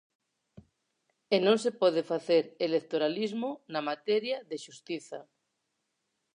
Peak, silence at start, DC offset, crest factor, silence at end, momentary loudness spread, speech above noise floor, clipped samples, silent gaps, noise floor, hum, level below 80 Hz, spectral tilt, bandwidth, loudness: -12 dBFS; 1.3 s; under 0.1%; 20 dB; 1.15 s; 14 LU; 52 dB; under 0.1%; none; -81 dBFS; none; -80 dBFS; -5 dB/octave; 10.5 kHz; -30 LUFS